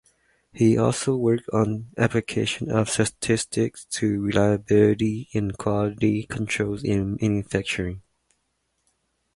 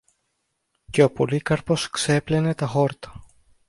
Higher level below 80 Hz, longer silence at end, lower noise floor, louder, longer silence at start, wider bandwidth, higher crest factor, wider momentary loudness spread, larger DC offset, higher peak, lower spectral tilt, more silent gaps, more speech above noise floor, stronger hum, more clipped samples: about the same, -48 dBFS vs -52 dBFS; first, 1.35 s vs 0.45 s; about the same, -73 dBFS vs -75 dBFS; about the same, -24 LUFS vs -22 LUFS; second, 0.55 s vs 0.9 s; about the same, 11.5 kHz vs 11.5 kHz; about the same, 20 dB vs 20 dB; about the same, 7 LU vs 7 LU; neither; about the same, -4 dBFS vs -4 dBFS; about the same, -5.5 dB/octave vs -5.5 dB/octave; neither; about the same, 51 dB vs 53 dB; neither; neither